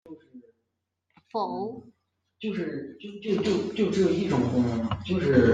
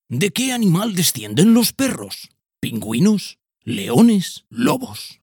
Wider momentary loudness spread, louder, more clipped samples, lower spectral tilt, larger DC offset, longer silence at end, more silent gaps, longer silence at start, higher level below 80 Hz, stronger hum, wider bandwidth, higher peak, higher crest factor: about the same, 14 LU vs 16 LU; second, -27 LUFS vs -18 LUFS; neither; first, -7 dB/octave vs -5 dB/octave; neither; about the same, 0 s vs 0.1 s; neither; about the same, 0.05 s vs 0.1 s; about the same, -60 dBFS vs -60 dBFS; neither; second, 9.2 kHz vs 19 kHz; second, -6 dBFS vs -2 dBFS; about the same, 20 dB vs 18 dB